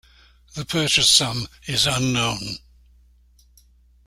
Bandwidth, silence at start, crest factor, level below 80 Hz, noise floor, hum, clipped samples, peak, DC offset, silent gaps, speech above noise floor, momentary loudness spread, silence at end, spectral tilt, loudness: 16 kHz; 0.55 s; 22 dB; -48 dBFS; -55 dBFS; none; under 0.1%; -2 dBFS; under 0.1%; none; 34 dB; 20 LU; 1.5 s; -2.5 dB/octave; -19 LUFS